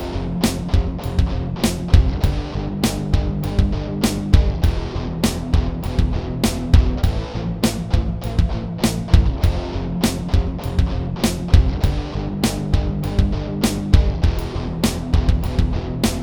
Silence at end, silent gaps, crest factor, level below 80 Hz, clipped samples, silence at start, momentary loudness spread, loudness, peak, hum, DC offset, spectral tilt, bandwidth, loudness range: 0 s; none; 18 dB; -22 dBFS; under 0.1%; 0 s; 6 LU; -20 LUFS; 0 dBFS; none; under 0.1%; -6 dB/octave; over 20 kHz; 1 LU